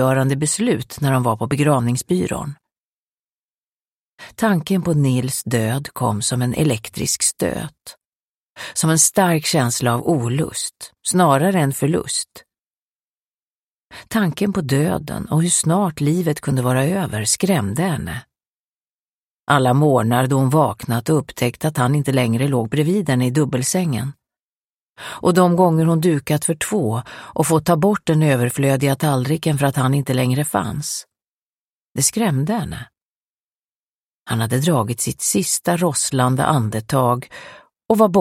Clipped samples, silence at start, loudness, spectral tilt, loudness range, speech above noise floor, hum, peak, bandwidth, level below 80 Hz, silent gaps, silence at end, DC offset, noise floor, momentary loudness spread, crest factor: under 0.1%; 0 s; -18 LUFS; -5 dB/octave; 5 LU; over 72 dB; none; 0 dBFS; 16.5 kHz; -50 dBFS; 2.78-4.18 s, 8.05-8.55 s, 12.66-13.88 s, 18.47-19.47 s, 24.39-24.95 s, 31.27-31.92 s, 33.06-34.26 s; 0 s; under 0.1%; under -90 dBFS; 9 LU; 18 dB